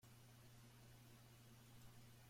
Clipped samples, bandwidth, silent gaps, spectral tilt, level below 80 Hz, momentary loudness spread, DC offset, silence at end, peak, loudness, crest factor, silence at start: under 0.1%; 16.5 kHz; none; -4.5 dB/octave; -76 dBFS; 1 LU; under 0.1%; 0 s; -50 dBFS; -66 LUFS; 14 dB; 0 s